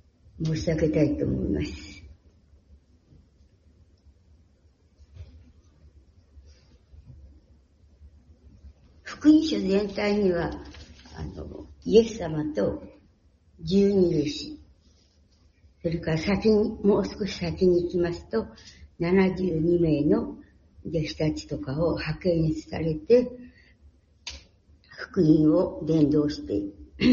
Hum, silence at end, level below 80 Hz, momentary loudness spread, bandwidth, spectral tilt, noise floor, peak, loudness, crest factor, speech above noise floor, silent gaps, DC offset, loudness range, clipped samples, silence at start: none; 0 s; -46 dBFS; 19 LU; 7.4 kHz; -7.5 dB/octave; -61 dBFS; -6 dBFS; -25 LUFS; 20 dB; 36 dB; none; under 0.1%; 4 LU; under 0.1%; 0.35 s